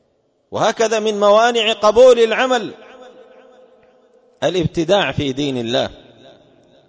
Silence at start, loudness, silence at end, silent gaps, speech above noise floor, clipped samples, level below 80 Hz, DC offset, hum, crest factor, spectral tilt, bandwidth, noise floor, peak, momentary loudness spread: 0.5 s; -15 LUFS; 0.95 s; none; 47 dB; under 0.1%; -48 dBFS; under 0.1%; none; 16 dB; -4.5 dB/octave; 8 kHz; -62 dBFS; -2 dBFS; 11 LU